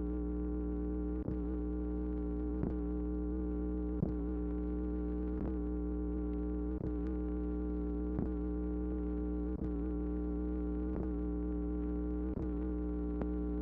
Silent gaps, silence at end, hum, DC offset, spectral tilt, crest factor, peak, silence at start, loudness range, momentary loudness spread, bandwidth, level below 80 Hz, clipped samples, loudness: none; 0 s; 60 Hz at -40 dBFS; under 0.1%; -12 dB/octave; 16 dB; -22 dBFS; 0 s; 0 LU; 1 LU; 2.7 kHz; -40 dBFS; under 0.1%; -38 LUFS